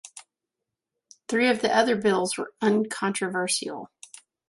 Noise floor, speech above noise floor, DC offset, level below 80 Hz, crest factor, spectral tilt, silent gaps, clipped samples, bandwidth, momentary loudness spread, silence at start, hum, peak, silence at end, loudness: -86 dBFS; 61 dB; under 0.1%; -70 dBFS; 20 dB; -3.5 dB/octave; none; under 0.1%; 11.5 kHz; 18 LU; 0.05 s; none; -8 dBFS; 0.65 s; -24 LUFS